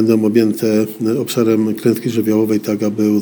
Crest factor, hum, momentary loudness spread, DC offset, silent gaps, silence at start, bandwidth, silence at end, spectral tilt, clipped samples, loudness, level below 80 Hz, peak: 14 dB; none; 4 LU; under 0.1%; none; 0 s; over 20 kHz; 0 s; -6.5 dB/octave; under 0.1%; -16 LUFS; -62 dBFS; 0 dBFS